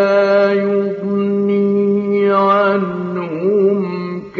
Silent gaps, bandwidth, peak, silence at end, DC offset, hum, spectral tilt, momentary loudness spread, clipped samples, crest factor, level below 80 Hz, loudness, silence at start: none; 6.4 kHz; -2 dBFS; 0 s; under 0.1%; none; -6 dB/octave; 8 LU; under 0.1%; 12 dB; -62 dBFS; -15 LUFS; 0 s